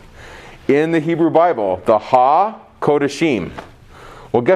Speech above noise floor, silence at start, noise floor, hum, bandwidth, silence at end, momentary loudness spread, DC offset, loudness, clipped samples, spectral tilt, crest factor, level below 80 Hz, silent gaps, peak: 24 dB; 0.2 s; -39 dBFS; none; 11.5 kHz; 0 s; 12 LU; under 0.1%; -16 LUFS; under 0.1%; -6.5 dB/octave; 16 dB; -48 dBFS; none; 0 dBFS